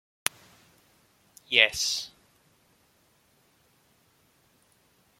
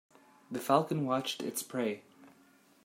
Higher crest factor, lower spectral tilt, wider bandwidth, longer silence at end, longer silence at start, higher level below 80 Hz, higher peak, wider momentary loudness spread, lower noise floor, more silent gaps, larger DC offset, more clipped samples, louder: first, 34 dB vs 22 dB; second, 1 dB/octave vs -4.5 dB/octave; about the same, 16.5 kHz vs 16 kHz; first, 3.15 s vs 0.55 s; first, 1.5 s vs 0.5 s; first, -68 dBFS vs -78 dBFS; first, 0 dBFS vs -12 dBFS; about the same, 12 LU vs 11 LU; about the same, -66 dBFS vs -64 dBFS; neither; neither; neither; first, -25 LUFS vs -33 LUFS